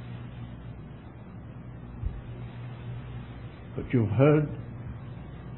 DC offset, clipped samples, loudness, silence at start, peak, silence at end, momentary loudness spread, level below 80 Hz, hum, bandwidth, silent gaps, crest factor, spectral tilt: under 0.1%; under 0.1%; -30 LUFS; 0 s; -8 dBFS; 0 s; 21 LU; -46 dBFS; none; 4.1 kHz; none; 24 dB; -12 dB/octave